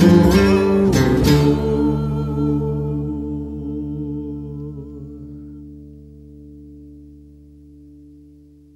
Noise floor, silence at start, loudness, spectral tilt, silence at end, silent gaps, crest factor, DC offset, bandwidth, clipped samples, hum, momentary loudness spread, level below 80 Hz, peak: -46 dBFS; 0 s; -18 LUFS; -7 dB/octave; 1.65 s; none; 18 dB; under 0.1%; 15.5 kHz; under 0.1%; none; 22 LU; -32 dBFS; -2 dBFS